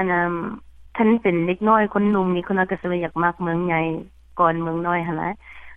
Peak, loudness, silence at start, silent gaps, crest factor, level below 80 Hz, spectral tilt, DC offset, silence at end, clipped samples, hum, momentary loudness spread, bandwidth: -4 dBFS; -21 LUFS; 0 s; none; 18 dB; -50 dBFS; -9.5 dB/octave; under 0.1%; 0 s; under 0.1%; none; 14 LU; 3.8 kHz